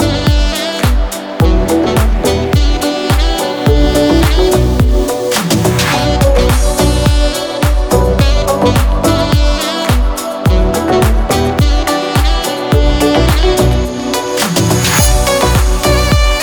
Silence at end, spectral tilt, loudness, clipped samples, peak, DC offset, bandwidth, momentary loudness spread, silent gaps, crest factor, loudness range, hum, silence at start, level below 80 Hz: 0 s; -5 dB/octave; -12 LUFS; under 0.1%; 0 dBFS; under 0.1%; over 20 kHz; 4 LU; none; 10 dB; 1 LU; none; 0 s; -14 dBFS